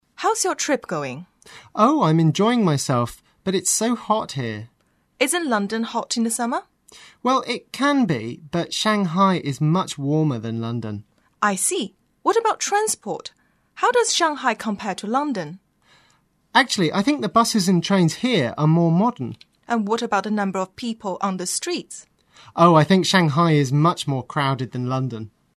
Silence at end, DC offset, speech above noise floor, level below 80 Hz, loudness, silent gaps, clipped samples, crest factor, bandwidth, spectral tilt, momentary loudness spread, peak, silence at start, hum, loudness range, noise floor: 0.3 s; under 0.1%; 41 dB; -62 dBFS; -21 LUFS; none; under 0.1%; 20 dB; 13.5 kHz; -4.5 dB/octave; 12 LU; 0 dBFS; 0.2 s; none; 4 LU; -62 dBFS